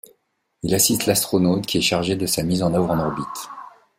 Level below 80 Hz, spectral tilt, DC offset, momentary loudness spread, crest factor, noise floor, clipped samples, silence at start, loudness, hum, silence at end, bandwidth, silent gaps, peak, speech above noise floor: -50 dBFS; -4 dB/octave; under 0.1%; 14 LU; 18 dB; -70 dBFS; under 0.1%; 0.65 s; -20 LUFS; none; 0.3 s; 16.5 kHz; none; -2 dBFS; 50 dB